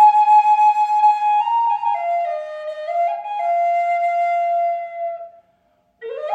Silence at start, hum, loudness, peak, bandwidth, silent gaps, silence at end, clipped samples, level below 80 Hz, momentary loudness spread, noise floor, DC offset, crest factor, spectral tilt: 0 s; none; -18 LUFS; -4 dBFS; 8 kHz; none; 0 s; under 0.1%; -78 dBFS; 15 LU; -62 dBFS; under 0.1%; 14 dB; -0.5 dB/octave